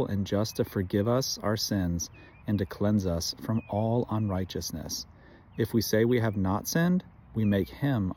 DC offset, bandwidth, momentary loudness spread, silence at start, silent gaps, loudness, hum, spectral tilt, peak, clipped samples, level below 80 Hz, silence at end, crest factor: under 0.1%; 17 kHz; 9 LU; 0 s; none; -29 LUFS; none; -5.5 dB/octave; -12 dBFS; under 0.1%; -54 dBFS; 0 s; 16 dB